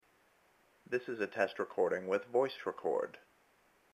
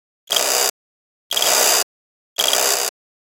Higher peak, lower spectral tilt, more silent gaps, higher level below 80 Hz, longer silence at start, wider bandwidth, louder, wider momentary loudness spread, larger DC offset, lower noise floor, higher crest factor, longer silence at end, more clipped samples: second, -16 dBFS vs 0 dBFS; first, -5.5 dB/octave vs 2 dB/octave; second, none vs 0.70-1.30 s, 1.83-2.36 s; second, -82 dBFS vs -70 dBFS; first, 0.9 s vs 0.3 s; second, 13.5 kHz vs 17.5 kHz; second, -36 LUFS vs -17 LUFS; second, 6 LU vs 10 LU; neither; second, -70 dBFS vs under -90 dBFS; about the same, 20 dB vs 20 dB; first, 0.75 s vs 0.4 s; neither